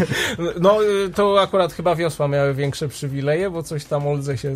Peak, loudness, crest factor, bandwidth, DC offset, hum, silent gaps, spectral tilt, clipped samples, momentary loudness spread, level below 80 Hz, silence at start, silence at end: -4 dBFS; -20 LUFS; 16 dB; 15.5 kHz; under 0.1%; none; none; -5.5 dB/octave; under 0.1%; 8 LU; -48 dBFS; 0 s; 0 s